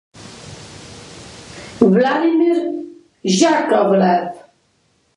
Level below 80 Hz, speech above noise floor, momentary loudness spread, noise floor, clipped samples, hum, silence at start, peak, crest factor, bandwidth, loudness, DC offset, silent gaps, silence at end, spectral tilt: -54 dBFS; 47 dB; 22 LU; -61 dBFS; under 0.1%; none; 0.15 s; 0 dBFS; 18 dB; 11.5 kHz; -15 LUFS; under 0.1%; none; 0.8 s; -5.5 dB/octave